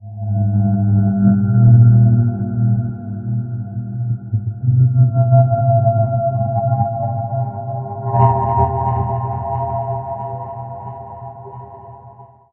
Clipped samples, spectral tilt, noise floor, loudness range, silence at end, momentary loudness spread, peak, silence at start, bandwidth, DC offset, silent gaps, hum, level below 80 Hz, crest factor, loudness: under 0.1%; -13 dB/octave; -41 dBFS; 8 LU; 0.3 s; 17 LU; 0 dBFS; 0 s; 2.1 kHz; under 0.1%; none; none; -44 dBFS; 16 dB; -16 LUFS